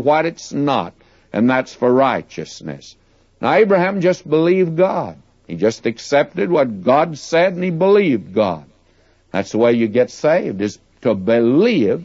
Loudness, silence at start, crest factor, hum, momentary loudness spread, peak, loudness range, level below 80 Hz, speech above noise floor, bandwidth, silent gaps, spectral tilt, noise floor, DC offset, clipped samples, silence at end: -17 LUFS; 0 s; 14 dB; none; 12 LU; -2 dBFS; 2 LU; -58 dBFS; 39 dB; 8 kHz; none; -6.5 dB/octave; -55 dBFS; under 0.1%; under 0.1%; 0 s